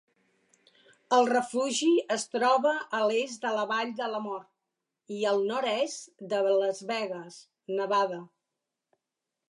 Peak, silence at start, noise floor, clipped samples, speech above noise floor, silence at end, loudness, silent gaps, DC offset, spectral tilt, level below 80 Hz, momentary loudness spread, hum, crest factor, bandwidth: -12 dBFS; 1.1 s; -87 dBFS; under 0.1%; 59 dB; 1.25 s; -28 LUFS; none; under 0.1%; -3 dB/octave; -86 dBFS; 14 LU; none; 18 dB; 11.5 kHz